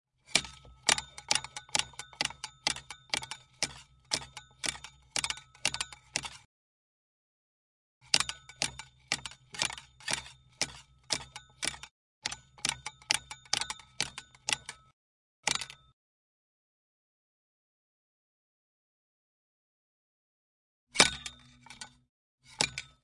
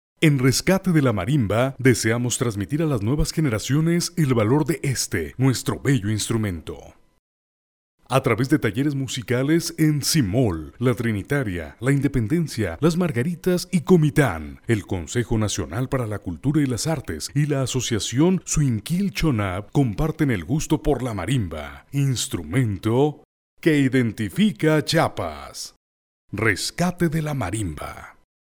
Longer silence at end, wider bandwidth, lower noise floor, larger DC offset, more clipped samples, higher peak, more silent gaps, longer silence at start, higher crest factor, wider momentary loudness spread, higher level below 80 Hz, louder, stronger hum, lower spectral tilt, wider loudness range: second, 0.15 s vs 0.4 s; second, 11.5 kHz vs 20 kHz; second, -55 dBFS vs under -90 dBFS; neither; neither; about the same, -2 dBFS vs -4 dBFS; first, 6.45-8.01 s, 11.91-12.22 s, 14.93-15.43 s, 15.93-20.87 s, 22.09-22.38 s vs 7.19-7.98 s, 23.25-23.57 s, 25.76-26.28 s; about the same, 0.3 s vs 0.2 s; first, 36 dB vs 18 dB; first, 19 LU vs 8 LU; second, -62 dBFS vs -40 dBFS; second, -33 LUFS vs -22 LUFS; neither; second, 0 dB/octave vs -5.5 dB/octave; about the same, 5 LU vs 3 LU